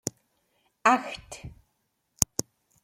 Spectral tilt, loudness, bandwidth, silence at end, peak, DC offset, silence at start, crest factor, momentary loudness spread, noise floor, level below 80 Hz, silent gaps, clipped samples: -2.5 dB/octave; -27 LUFS; 16.5 kHz; 0.6 s; 0 dBFS; under 0.1%; 0.85 s; 32 dB; 20 LU; -76 dBFS; -54 dBFS; none; under 0.1%